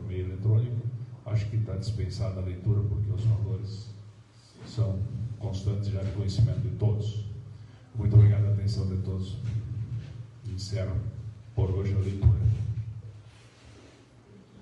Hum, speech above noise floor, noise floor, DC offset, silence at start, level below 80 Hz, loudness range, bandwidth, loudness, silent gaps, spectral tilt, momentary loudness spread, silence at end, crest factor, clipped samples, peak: none; 27 dB; -54 dBFS; under 0.1%; 0 s; -46 dBFS; 5 LU; 8 kHz; -29 LUFS; none; -8 dB/octave; 16 LU; 0.05 s; 20 dB; under 0.1%; -8 dBFS